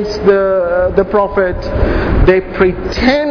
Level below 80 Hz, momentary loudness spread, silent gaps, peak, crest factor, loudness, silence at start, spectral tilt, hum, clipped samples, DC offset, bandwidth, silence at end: -20 dBFS; 5 LU; none; 0 dBFS; 12 dB; -13 LUFS; 0 s; -7.5 dB/octave; none; 0.2%; under 0.1%; 5.4 kHz; 0 s